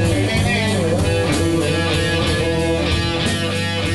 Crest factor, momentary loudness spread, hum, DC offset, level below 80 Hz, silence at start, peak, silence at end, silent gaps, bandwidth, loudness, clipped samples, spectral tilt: 12 dB; 2 LU; none; 1%; -30 dBFS; 0 s; -6 dBFS; 0 s; none; 12.5 kHz; -18 LUFS; under 0.1%; -5 dB/octave